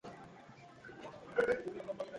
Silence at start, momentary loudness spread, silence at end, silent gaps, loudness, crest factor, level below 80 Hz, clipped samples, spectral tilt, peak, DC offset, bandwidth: 0.05 s; 21 LU; 0 s; none; -37 LUFS; 22 dB; -72 dBFS; under 0.1%; -5.5 dB/octave; -20 dBFS; under 0.1%; 11 kHz